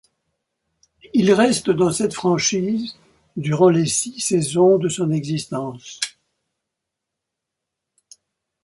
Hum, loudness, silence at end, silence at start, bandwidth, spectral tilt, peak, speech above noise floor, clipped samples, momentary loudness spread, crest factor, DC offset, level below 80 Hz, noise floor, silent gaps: none; -19 LUFS; 2.55 s; 1.15 s; 11.5 kHz; -5 dB/octave; -2 dBFS; 64 dB; under 0.1%; 12 LU; 18 dB; under 0.1%; -58 dBFS; -82 dBFS; none